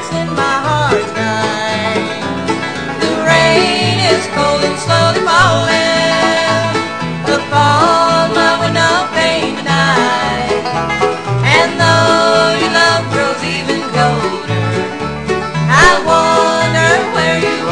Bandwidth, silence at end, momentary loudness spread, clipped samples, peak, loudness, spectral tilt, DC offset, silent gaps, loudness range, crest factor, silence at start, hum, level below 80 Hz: 10 kHz; 0 s; 8 LU; under 0.1%; 0 dBFS; -12 LUFS; -4.5 dB/octave; 0.8%; none; 2 LU; 12 dB; 0 s; none; -38 dBFS